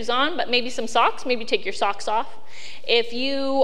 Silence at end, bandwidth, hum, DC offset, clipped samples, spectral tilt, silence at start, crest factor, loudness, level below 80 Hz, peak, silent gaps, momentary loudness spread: 0 s; 12 kHz; none; 5%; under 0.1%; -2.5 dB/octave; 0 s; 20 dB; -23 LUFS; -62 dBFS; -2 dBFS; none; 13 LU